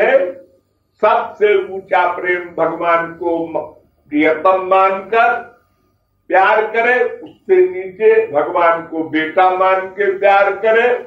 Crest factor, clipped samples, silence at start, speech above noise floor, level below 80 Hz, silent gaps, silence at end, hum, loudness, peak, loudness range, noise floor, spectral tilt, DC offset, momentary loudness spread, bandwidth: 14 dB; under 0.1%; 0 s; 47 dB; -62 dBFS; none; 0 s; none; -15 LUFS; -2 dBFS; 3 LU; -61 dBFS; -6.5 dB/octave; under 0.1%; 8 LU; 7 kHz